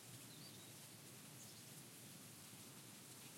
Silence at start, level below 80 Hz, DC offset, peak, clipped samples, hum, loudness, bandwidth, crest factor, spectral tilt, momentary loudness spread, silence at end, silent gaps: 0 s; under -90 dBFS; under 0.1%; -46 dBFS; under 0.1%; none; -57 LUFS; 16.5 kHz; 14 dB; -2.5 dB/octave; 1 LU; 0 s; none